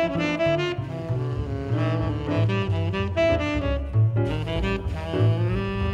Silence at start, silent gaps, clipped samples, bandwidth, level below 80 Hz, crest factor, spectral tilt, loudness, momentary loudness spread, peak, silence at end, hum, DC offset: 0 s; none; under 0.1%; 7.6 kHz; -36 dBFS; 14 dB; -7.5 dB/octave; -25 LUFS; 6 LU; -10 dBFS; 0 s; none; under 0.1%